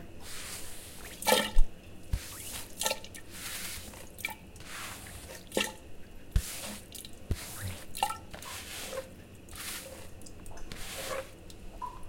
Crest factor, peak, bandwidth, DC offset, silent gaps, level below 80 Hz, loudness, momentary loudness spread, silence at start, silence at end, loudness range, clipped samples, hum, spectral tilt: 26 dB; -8 dBFS; 17 kHz; under 0.1%; none; -38 dBFS; -37 LUFS; 15 LU; 0 s; 0 s; 7 LU; under 0.1%; none; -2.5 dB/octave